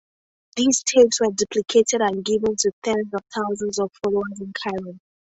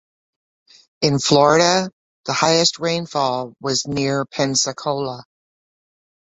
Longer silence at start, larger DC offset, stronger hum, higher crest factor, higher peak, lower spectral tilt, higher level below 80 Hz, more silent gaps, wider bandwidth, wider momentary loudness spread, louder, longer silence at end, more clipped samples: second, 0.55 s vs 1 s; neither; neither; about the same, 18 dB vs 20 dB; about the same, -4 dBFS vs -2 dBFS; about the same, -3 dB/octave vs -3.5 dB/octave; about the same, -58 dBFS vs -58 dBFS; second, 2.73-2.82 s vs 1.93-2.24 s; about the same, 8.2 kHz vs 8.4 kHz; about the same, 12 LU vs 11 LU; second, -21 LUFS vs -18 LUFS; second, 0.35 s vs 1.15 s; neither